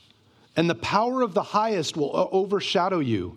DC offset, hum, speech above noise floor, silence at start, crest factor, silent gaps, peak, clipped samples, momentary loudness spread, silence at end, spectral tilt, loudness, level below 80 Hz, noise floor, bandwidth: under 0.1%; none; 34 dB; 0.55 s; 20 dB; none; -6 dBFS; under 0.1%; 3 LU; 0 s; -5.5 dB/octave; -24 LUFS; -60 dBFS; -58 dBFS; 12.5 kHz